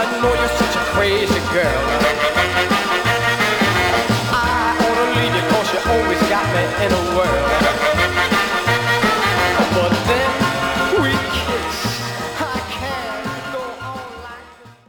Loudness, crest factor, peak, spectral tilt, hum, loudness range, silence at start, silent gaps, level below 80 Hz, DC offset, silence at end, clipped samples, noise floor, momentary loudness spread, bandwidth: -17 LUFS; 14 dB; -4 dBFS; -4 dB/octave; none; 5 LU; 0 s; none; -36 dBFS; under 0.1%; 0.15 s; under 0.1%; -42 dBFS; 9 LU; over 20 kHz